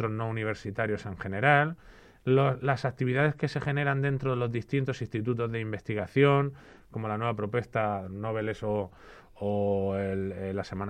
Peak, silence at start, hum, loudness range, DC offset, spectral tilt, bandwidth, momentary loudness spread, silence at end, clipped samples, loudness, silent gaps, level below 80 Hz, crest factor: -8 dBFS; 0 s; none; 4 LU; under 0.1%; -8 dB/octave; 9 kHz; 11 LU; 0 s; under 0.1%; -29 LUFS; none; -58 dBFS; 22 dB